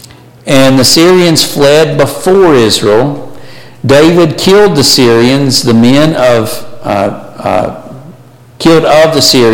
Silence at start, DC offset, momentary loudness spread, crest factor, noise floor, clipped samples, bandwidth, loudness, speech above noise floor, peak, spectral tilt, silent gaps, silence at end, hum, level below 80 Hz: 0.45 s; under 0.1%; 11 LU; 6 dB; -35 dBFS; 0.3%; 17.5 kHz; -6 LUFS; 29 dB; 0 dBFS; -4.5 dB/octave; none; 0 s; none; -36 dBFS